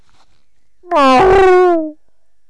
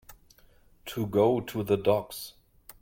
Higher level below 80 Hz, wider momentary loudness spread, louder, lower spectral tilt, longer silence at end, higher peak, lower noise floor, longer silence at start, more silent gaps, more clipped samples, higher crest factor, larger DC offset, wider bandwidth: first, -34 dBFS vs -58 dBFS; second, 10 LU vs 17 LU; first, -10 LUFS vs -27 LUFS; about the same, -5.5 dB/octave vs -6.5 dB/octave; about the same, 0.55 s vs 0.5 s; first, -6 dBFS vs -12 dBFS; first, -66 dBFS vs -59 dBFS; first, 0.9 s vs 0.1 s; neither; neither; second, 6 dB vs 18 dB; neither; second, 11 kHz vs 17 kHz